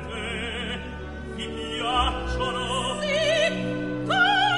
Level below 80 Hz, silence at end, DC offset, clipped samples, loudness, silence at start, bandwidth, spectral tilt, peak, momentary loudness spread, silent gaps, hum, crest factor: -38 dBFS; 0 s; 0.3%; under 0.1%; -25 LUFS; 0 s; 11.5 kHz; -4 dB/octave; -10 dBFS; 12 LU; none; none; 16 dB